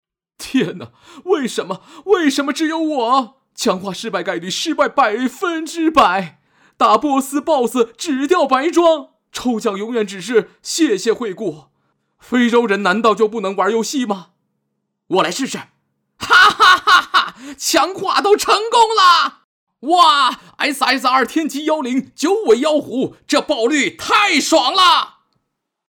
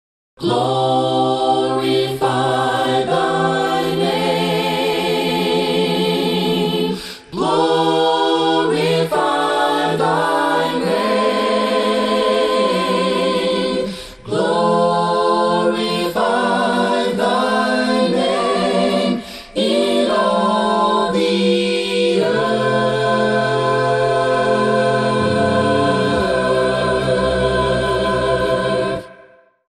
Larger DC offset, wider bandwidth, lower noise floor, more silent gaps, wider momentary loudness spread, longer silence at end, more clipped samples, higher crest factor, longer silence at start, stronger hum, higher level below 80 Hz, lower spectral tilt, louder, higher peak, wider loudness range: neither; first, over 20 kHz vs 13 kHz; first, -74 dBFS vs -48 dBFS; first, 19.44-19.67 s vs none; first, 12 LU vs 3 LU; first, 0.8 s vs 0.55 s; neither; about the same, 14 dB vs 14 dB; about the same, 0.4 s vs 0.4 s; neither; second, -56 dBFS vs -44 dBFS; second, -2.5 dB/octave vs -5 dB/octave; about the same, -15 LUFS vs -17 LUFS; about the same, -2 dBFS vs -2 dBFS; first, 5 LU vs 1 LU